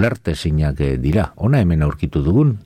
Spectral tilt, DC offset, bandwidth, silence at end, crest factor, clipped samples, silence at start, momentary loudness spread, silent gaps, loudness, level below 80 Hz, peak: -8 dB/octave; under 0.1%; 10.5 kHz; 0.05 s; 12 dB; under 0.1%; 0 s; 5 LU; none; -18 LUFS; -28 dBFS; -4 dBFS